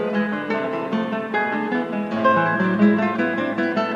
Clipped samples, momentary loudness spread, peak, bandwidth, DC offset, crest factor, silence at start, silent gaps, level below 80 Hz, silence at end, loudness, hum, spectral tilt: under 0.1%; 7 LU; -6 dBFS; 7.2 kHz; under 0.1%; 16 dB; 0 s; none; -64 dBFS; 0 s; -21 LUFS; none; -7.5 dB/octave